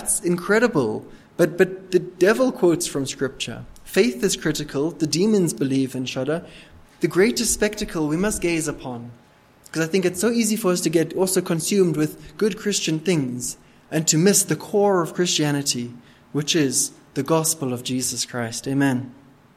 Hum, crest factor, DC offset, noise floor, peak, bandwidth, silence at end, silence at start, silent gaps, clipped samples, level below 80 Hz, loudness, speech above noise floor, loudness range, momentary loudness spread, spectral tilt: none; 20 dB; under 0.1%; -51 dBFS; -2 dBFS; 16 kHz; 0.45 s; 0 s; none; under 0.1%; -50 dBFS; -21 LUFS; 30 dB; 3 LU; 9 LU; -4 dB/octave